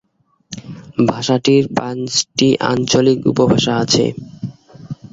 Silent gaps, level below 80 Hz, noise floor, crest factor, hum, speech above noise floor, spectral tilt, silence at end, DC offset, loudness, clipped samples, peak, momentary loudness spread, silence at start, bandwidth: none; -50 dBFS; -58 dBFS; 16 dB; none; 43 dB; -4.5 dB/octave; 0.2 s; under 0.1%; -15 LUFS; under 0.1%; 0 dBFS; 18 LU; 0.5 s; 7.8 kHz